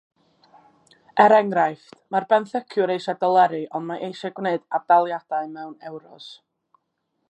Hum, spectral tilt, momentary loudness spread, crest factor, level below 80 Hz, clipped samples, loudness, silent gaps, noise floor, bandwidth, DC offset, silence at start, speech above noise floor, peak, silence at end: none; -6 dB/octave; 22 LU; 20 dB; -82 dBFS; under 0.1%; -21 LUFS; none; -75 dBFS; 8.6 kHz; under 0.1%; 1.15 s; 53 dB; -2 dBFS; 0.95 s